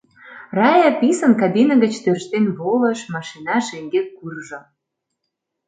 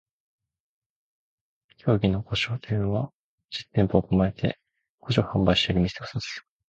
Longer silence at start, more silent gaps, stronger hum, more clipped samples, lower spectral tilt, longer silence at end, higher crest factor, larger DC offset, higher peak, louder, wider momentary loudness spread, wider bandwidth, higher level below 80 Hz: second, 0.25 s vs 1.85 s; second, none vs 3.14-3.38 s, 4.89-4.98 s; neither; neither; about the same, -5.5 dB/octave vs -6.5 dB/octave; first, 1.05 s vs 0.3 s; second, 16 dB vs 22 dB; neither; first, -2 dBFS vs -6 dBFS; first, -18 LUFS vs -25 LUFS; first, 17 LU vs 14 LU; first, 9.4 kHz vs 8 kHz; second, -68 dBFS vs -46 dBFS